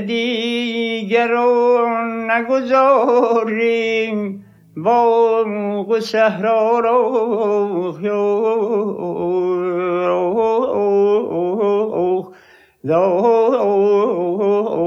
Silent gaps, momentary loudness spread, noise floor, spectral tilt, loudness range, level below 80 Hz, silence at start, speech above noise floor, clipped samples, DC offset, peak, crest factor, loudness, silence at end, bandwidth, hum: none; 7 LU; -48 dBFS; -6.5 dB/octave; 2 LU; -64 dBFS; 0 s; 32 dB; under 0.1%; under 0.1%; -2 dBFS; 14 dB; -17 LUFS; 0 s; 7.4 kHz; none